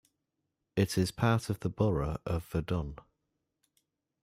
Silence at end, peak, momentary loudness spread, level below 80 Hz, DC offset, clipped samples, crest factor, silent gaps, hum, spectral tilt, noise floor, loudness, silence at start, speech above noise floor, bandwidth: 1.25 s; -14 dBFS; 7 LU; -50 dBFS; under 0.1%; under 0.1%; 18 dB; none; none; -6.5 dB/octave; -84 dBFS; -32 LUFS; 0.75 s; 53 dB; 16 kHz